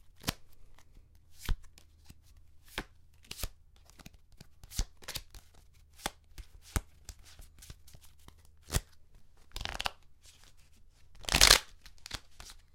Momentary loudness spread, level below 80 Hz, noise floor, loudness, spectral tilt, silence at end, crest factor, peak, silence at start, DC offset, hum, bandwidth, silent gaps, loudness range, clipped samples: 30 LU; -46 dBFS; -58 dBFS; -32 LUFS; -1 dB/octave; 0.2 s; 34 dB; -2 dBFS; 0.25 s; under 0.1%; none; 16.5 kHz; none; 17 LU; under 0.1%